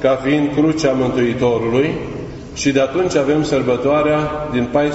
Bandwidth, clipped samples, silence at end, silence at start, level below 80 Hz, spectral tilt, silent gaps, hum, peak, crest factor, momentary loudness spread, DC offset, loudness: 8.2 kHz; under 0.1%; 0 s; 0 s; -40 dBFS; -6 dB/octave; none; none; -2 dBFS; 14 dB; 5 LU; under 0.1%; -16 LUFS